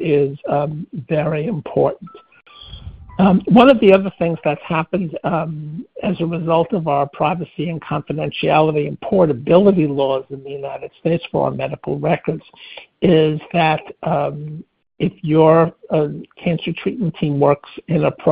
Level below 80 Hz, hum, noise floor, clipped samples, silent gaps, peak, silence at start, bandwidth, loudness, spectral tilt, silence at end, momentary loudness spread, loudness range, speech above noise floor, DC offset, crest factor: -48 dBFS; none; -36 dBFS; under 0.1%; none; 0 dBFS; 0 s; 5 kHz; -17 LUFS; -10 dB/octave; 0 s; 16 LU; 5 LU; 19 dB; under 0.1%; 18 dB